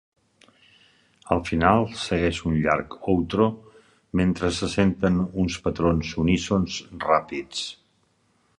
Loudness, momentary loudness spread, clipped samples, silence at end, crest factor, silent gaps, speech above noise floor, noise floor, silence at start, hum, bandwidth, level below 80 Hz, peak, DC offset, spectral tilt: -24 LUFS; 9 LU; under 0.1%; 0.85 s; 22 dB; none; 43 dB; -66 dBFS; 1.25 s; none; 11 kHz; -42 dBFS; -2 dBFS; under 0.1%; -6 dB/octave